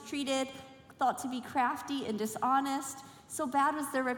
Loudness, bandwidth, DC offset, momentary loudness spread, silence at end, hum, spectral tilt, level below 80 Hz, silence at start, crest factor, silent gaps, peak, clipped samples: -33 LUFS; 18 kHz; under 0.1%; 12 LU; 0 s; none; -3 dB/octave; -74 dBFS; 0 s; 16 dB; none; -16 dBFS; under 0.1%